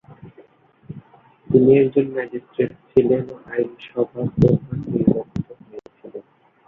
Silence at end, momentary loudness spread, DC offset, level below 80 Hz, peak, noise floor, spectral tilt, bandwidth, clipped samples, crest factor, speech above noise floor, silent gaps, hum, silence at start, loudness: 0.45 s; 25 LU; under 0.1%; -48 dBFS; -2 dBFS; -52 dBFS; -10.5 dB/octave; 4.1 kHz; under 0.1%; 20 dB; 33 dB; none; none; 0.1 s; -20 LUFS